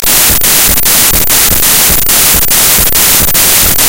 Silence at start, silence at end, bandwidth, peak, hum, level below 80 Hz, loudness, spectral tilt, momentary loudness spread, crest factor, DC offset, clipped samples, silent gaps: 0 s; 0 s; over 20 kHz; 0 dBFS; none; -22 dBFS; -4 LUFS; -0.5 dB/octave; 1 LU; 8 dB; 10%; 5%; none